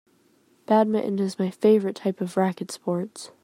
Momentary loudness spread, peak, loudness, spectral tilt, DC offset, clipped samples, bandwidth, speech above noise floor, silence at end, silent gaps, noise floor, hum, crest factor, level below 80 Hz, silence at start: 9 LU; -6 dBFS; -24 LUFS; -6.5 dB/octave; under 0.1%; under 0.1%; 15 kHz; 38 dB; 0.15 s; none; -62 dBFS; none; 18 dB; -74 dBFS; 0.7 s